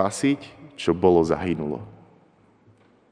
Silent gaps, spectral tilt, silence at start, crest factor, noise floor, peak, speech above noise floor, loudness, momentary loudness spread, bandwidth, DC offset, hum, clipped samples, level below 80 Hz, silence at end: none; -6 dB/octave; 0 s; 20 dB; -58 dBFS; -4 dBFS; 36 dB; -23 LUFS; 18 LU; 10 kHz; under 0.1%; none; under 0.1%; -52 dBFS; 1.2 s